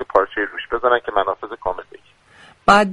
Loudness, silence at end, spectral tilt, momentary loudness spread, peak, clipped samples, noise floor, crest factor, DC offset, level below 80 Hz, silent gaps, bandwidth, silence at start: -19 LUFS; 0 s; -4.5 dB/octave; 12 LU; 0 dBFS; under 0.1%; -49 dBFS; 20 dB; under 0.1%; -46 dBFS; none; 11.5 kHz; 0 s